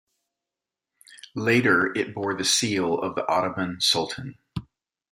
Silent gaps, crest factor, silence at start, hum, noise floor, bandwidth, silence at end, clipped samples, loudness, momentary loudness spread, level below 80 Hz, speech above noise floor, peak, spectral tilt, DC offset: none; 20 dB; 1.1 s; none; -88 dBFS; 16 kHz; 0.5 s; under 0.1%; -23 LUFS; 16 LU; -60 dBFS; 64 dB; -6 dBFS; -3 dB/octave; under 0.1%